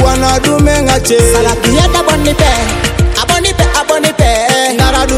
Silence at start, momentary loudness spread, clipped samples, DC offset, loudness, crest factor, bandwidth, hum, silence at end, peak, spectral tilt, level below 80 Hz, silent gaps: 0 s; 3 LU; 0.6%; under 0.1%; -10 LUFS; 10 dB; 16.5 kHz; none; 0 s; 0 dBFS; -4 dB/octave; -16 dBFS; none